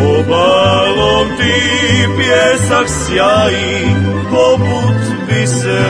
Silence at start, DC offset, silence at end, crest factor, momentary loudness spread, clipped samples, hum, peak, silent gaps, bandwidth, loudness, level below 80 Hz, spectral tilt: 0 s; under 0.1%; 0 s; 12 dB; 4 LU; under 0.1%; none; 0 dBFS; none; 10.5 kHz; -11 LUFS; -34 dBFS; -4.5 dB/octave